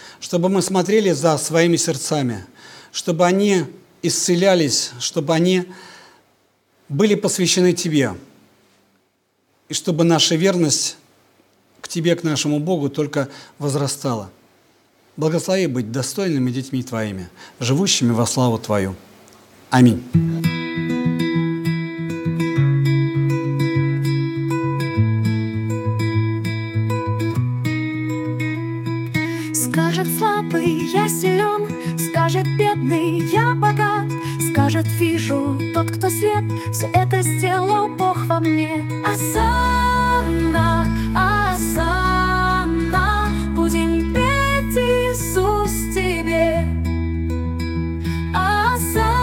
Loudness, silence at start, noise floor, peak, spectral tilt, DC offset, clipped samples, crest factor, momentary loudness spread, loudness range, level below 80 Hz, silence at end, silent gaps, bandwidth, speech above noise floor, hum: -19 LUFS; 0 s; -65 dBFS; 0 dBFS; -5 dB/octave; under 0.1%; under 0.1%; 18 dB; 7 LU; 4 LU; -34 dBFS; 0 s; none; 18 kHz; 47 dB; none